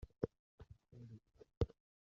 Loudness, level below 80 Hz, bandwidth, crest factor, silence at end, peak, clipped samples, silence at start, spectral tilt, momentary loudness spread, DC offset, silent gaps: -47 LUFS; -56 dBFS; 7.2 kHz; 26 dB; 0.45 s; -22 dBFS; under 0.1%; 0 s; -8.5 dB/octave; 21 LU; under 0.1%; 0.39-0.58 s, 1.57-1.61 s